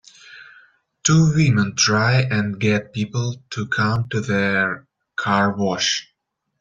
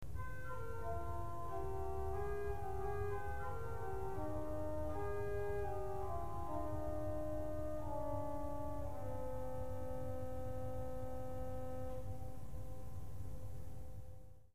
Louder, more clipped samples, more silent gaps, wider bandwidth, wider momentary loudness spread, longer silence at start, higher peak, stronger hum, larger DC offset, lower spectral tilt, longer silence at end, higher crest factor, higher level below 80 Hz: first, -19 LUFS vs -45 LUFS; neither; neither; second, 7.8 kHz vs 15.5 kHz; about the same, 10 LU vs 8 LU; first, 0.3 s vs 0 s; first, -4 dBFS vs -28 dBFS; neither; second, under 0.1% vs 0.8%; second, -4.5 dB/octave vs -8 dB/octave; first, 0.6 s vs 0 s; about the same, 18 dB vs 14 dB; about the same, -54 dBFS vs -52 dBFS